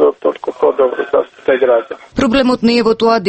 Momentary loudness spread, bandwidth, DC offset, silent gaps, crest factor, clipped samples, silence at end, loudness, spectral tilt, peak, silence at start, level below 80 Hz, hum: 6 LU; 8.8 kHz; under 0.1%; none; 12 dB; under 0.1%; 0 s; -14 LUFS; -5.5 dB/octave; 0 dBFS; 0 s; -42 dBFS; none